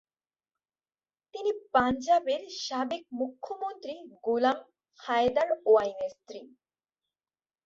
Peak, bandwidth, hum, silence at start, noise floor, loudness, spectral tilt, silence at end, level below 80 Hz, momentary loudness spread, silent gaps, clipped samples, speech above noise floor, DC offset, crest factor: -8 dBFS; 7.6 kHz; none; 1.35 s; under -90 dBFS; -29 LUFS; -4 dB/octave; 1.2 s; -64 dBFS; 17 LU; none; under 0.1%; over 61 dB; under 0.1%; 22 dB